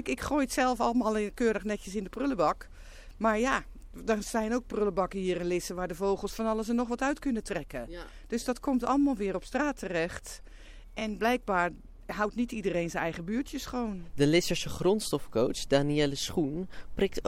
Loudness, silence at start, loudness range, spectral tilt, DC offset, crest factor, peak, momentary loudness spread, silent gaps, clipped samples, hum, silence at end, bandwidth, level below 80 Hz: -30 LUFS; 0 s; 3 LU; -5 dB/octave; under 0.1%; 20 dB; -10 dBFS; 10 LU; none; under 0.1%; none; 0 s; 16.5 kHz; -48 dBFS